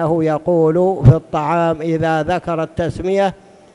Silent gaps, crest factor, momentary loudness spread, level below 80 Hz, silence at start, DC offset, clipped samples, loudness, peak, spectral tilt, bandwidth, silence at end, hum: none; 16 dB; 8 LU; -36 dBFS; 0 s; under 0.1%; 0.2%; -16 LUFS; 0 dBFS; -8.5 dB/octave; 10.5 kHz; 0.4 s; none